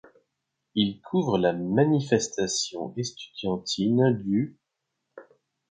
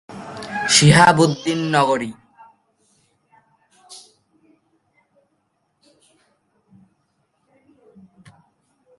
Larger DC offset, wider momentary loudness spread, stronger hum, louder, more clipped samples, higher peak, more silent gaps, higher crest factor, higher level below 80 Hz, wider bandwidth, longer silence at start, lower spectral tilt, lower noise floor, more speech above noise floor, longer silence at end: neither; second, 10 LU vs 29 LU; neither; second, -26 LUFS vs -15 LUFS; neither; second, -8 dBFS vs 0 dBFS; neither; about the same, 20 dB vs 22 dB; second, -62 dBFS vs -54 dBFS; second, 9.4 kHz vs 11.5 kHz; first, 0.75 s vs 0.1 s; about the same, -5 dB/octave vs -4 dB/octave; first, -82 dBFS vs -69 dBFS; about the same, 56 dB vs 54 dB; second, 0.5 s vs 5 s